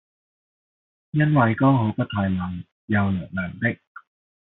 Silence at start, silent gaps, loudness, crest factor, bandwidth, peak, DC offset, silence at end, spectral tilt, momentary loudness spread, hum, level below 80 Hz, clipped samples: 1.15 s; 2.72-2.88 s; -22 LUFS; 18 dB; 4.1 kHz; -6 dBFS; under 0.1%; 0.8 s; -7 dB/octave; 12 LU; none; -60 dBFS; under 0.1%